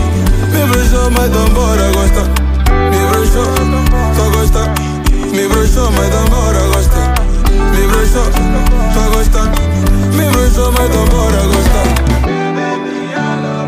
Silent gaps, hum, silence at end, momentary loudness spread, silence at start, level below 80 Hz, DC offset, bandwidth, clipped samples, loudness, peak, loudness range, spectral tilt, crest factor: none; none; 0 s; 4 LU; 0 s; -12 dBFS; under 0.1%; 16 kHz; under 0.1%; -12 LUFS; 0 dBFS; 1 LU; -5.5 dB/octave; 10 dB